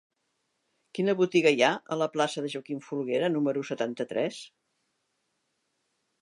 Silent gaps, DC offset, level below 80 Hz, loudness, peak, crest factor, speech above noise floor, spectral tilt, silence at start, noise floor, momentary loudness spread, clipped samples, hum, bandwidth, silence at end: none; under 0.1%; -84 dBFS; -28 LUFS; -8 dBFS; 22 dB; 50 dB; -5 dB/octave; 0.95 s; -78 dBFS; 12 LU; under 0.1%; none; 11.5 kHz; 1.75 s